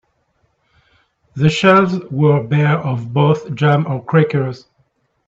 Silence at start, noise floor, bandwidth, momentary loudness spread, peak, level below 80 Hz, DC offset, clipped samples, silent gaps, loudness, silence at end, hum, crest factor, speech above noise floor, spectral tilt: 1.35 s; -63 dBFS; 7.8 kHz; 9 LU; 0 dBFS; -52 dBFS; under 0.1%; under 0.1%; none; -15 LUFS; 0.7 s; none; 16 dB; 49 dB; -7.5 dB/octave